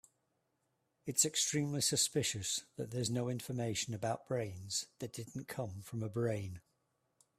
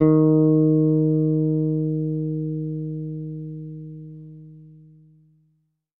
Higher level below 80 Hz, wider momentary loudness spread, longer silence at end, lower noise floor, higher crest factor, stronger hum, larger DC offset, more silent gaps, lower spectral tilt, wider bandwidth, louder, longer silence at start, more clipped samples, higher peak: second, -72 dBFS vs -54 dBFS; second, 13 LU vs 21 LU; second, 0.8 s vs 1.35 s; first, -82 dBFS vs -68 dBFS; about the same, 22 dB vs 18 dB; neither; neither; neither; second, -3.5 dB/octave vs -15 dB/octave; first, 15.5 kHz vs 2.2 kHz; second, -37 LUFS vs -21 LUFS; first, 1.05 s vs 0 s; neither; second, -16 dBFS vs -4 dBFS